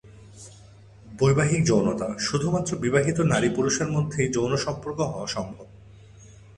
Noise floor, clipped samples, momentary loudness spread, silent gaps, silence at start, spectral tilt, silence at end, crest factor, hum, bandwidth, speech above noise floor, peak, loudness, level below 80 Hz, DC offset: -49 dBFS; under 0.1%; 12 LU; none; 0.05 s; -5.5 dB/octave; 0.2 s; 18 dB; none; 11 kHz; 25 dB; -6 dBFS; -24 LUFS; -52 dBFS; under 0.1%